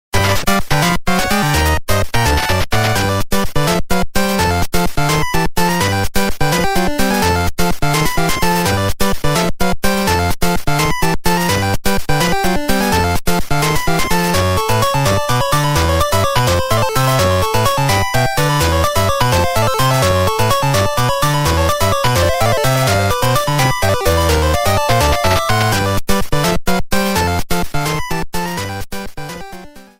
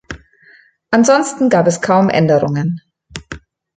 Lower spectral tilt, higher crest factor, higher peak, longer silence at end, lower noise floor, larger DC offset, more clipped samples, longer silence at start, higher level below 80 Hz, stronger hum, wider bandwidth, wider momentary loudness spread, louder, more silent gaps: about the same, -4.5 dB/octave vs -5.5 dB/octave; about the same, 14 dB vs 14 dB; about the same, 0 dBFS vs -2 dBFS; second, 0.15 s vs 0.4 s; second, -34 dBFS vs -48 dBFS; neither; neither; about the same, 0.15 s vs 0.1 s; first, -26 dBFS vs -48 dBFS; neither; first, 16.5 kHz vs 9.4 kHz; second, 4 LU vs 21 LU; about the same, -15 LUFS vs -13 LUFS; neither